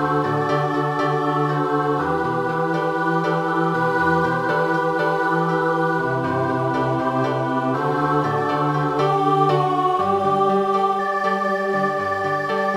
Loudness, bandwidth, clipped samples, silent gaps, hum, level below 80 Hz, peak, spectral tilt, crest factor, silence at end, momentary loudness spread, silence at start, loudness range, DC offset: -20 LUFS; 15 kHz; under 0.1%; none; none; -56 dBFS; -6 dBFS; -7 dB/octave; 14 dB; 0 s; 3 LU; 0 s; 2 LU; under 0.1%